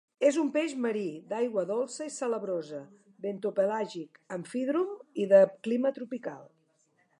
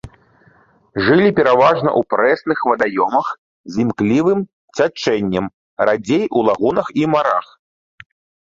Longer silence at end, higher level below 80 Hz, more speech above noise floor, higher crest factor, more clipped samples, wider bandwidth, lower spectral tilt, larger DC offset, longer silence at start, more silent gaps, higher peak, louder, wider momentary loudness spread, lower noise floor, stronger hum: second, 0.75 s vs 1 s; second, -88 dBFS vs -52 dBFS; first, 41 dB vs 37 dB; about the same, 20 dB vs 16 dB; neither; first, 11 kHz vs 7.8 kHz; about the same, -5.5 dB/octave vs -6.5 dB/octave; neither; first, 0.2 s vs 0.05 s; second, none vs 3.38-3.64 s, 4.53-4.68 s, 5.54-5.77 s; second, -10 dBFS vs 0 dBFS; second, -30 LUFS vs -16 LUFS; first, 17 LU vs 9 LU; first, -71 dBFS vs -53 dBFS; neither